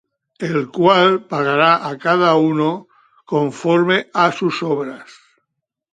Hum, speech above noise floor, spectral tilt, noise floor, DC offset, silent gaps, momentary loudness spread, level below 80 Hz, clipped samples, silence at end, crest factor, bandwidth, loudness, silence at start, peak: none; 61 dB; -6 dB/octave; -77 dBFS; under 0.1%; none; 9 LU; -66 dBFS; under 0.1%; 0.9 s; 18 dB; 9.4 kHz; -16 LUFS; 0.4 s; 0 dBFS